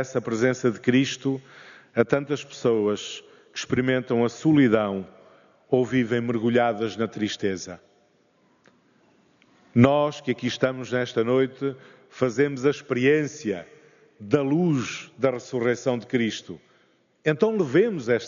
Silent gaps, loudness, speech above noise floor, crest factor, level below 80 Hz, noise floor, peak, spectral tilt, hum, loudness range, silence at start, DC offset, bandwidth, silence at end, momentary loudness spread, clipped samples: none; -24 LUFS; 40 dB; 22 dB; -66 dBFS; -63 dBFS; -2 dBFS; -5.5 dB/octave; none; 3 LU; 0 s; under 0.1%; 7.4 kHz; 0 s; 13 LU; under 0.1%